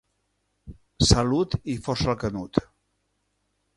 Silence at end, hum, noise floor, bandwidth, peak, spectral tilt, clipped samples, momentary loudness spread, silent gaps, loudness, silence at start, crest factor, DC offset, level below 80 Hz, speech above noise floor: 1.15 s; 50 Hz at -50 dBFS; -74 dBFS; 11.5 kHz; -2 dBFS; -5 dB/octave; under 0.1%; 9 LU; none; -24 LUFS; 0.65 s; 24 dB; under 0.1%; -38 dBFS; 50 dB